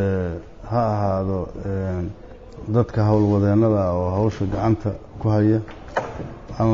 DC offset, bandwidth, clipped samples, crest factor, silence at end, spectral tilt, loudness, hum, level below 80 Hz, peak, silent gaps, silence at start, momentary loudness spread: under 0.1%; 7 kHz; under 0.1%; 14 dB; 0 s; -9.5 dB/octave; -22 LUFS; none; -40 dBFS; -8 dBFS; none; 0 s; 15 LU